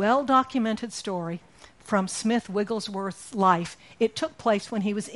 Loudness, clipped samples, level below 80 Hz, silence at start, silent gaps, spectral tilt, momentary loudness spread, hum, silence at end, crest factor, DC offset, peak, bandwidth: -26 LUFS; under 0.1%; -64 dBFS; 0 s; none; -5 dB/octave; 10 LU; none; 0 s; 18 dB; under 0.1%; -8 dBFS; 11.5 kHz